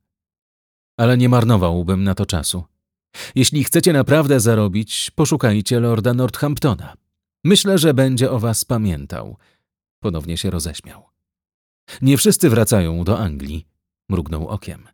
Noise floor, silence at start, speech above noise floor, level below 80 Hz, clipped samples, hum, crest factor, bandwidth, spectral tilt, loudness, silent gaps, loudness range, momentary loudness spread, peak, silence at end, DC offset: under -90 dBFS; 1 s; over 73 dB; -38 dBFS; under 0.1%; none; 16 dB; over 20 kHz; -5 dB/octave; -17 LUFS; 9.91-10.02 s, 11.54-11.87 s; 6 LU; 14 LU; -2 dBFS; 0.15 s; under 0.1%